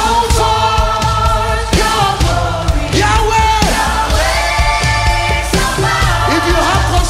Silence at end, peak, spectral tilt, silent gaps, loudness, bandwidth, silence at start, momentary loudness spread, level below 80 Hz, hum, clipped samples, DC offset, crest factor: 0 s; 0 dBFS; -4 dB/octave; none; -12 LUFS; 16 kHz; 0 s; 3 LU; -18 dBFS; none; under 0.1%; under 0.1%; 12 dB